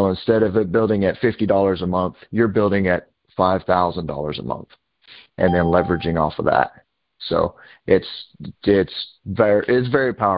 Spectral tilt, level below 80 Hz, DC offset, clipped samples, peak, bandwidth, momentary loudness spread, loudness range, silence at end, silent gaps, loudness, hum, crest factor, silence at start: -11.5 dB/octave; -42 dBFS; under 0.1%; under 0.1%; 0 dBFS; 5.2 kHz; 12 LU; 2 LU; 0 s; none; -20 LUFS; none; 20 dB; 0 s